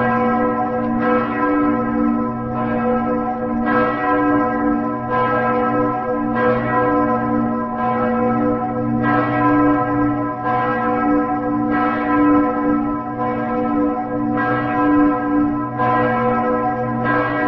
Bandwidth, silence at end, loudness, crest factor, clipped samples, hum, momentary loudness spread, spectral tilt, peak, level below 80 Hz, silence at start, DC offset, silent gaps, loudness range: 5.4 kHz; 0 s; -18 LUFS; 14 dB; under 0.1%; none; 5 LU; -10 dB/octave; -4 dBFS; -42 dBFS; 0 s; 0.2%; none; 1 LU